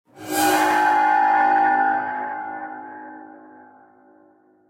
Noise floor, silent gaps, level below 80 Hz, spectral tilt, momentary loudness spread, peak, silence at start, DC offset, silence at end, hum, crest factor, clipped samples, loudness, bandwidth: -56 dBFS; none; -68 dBFS; -2 dB/octave; 19 LU; -8 dBFS; 0.15 s; under 0.1%; 1.4 s; none; 14 dB; under 0.1%; -19 LUFS; 16 kHz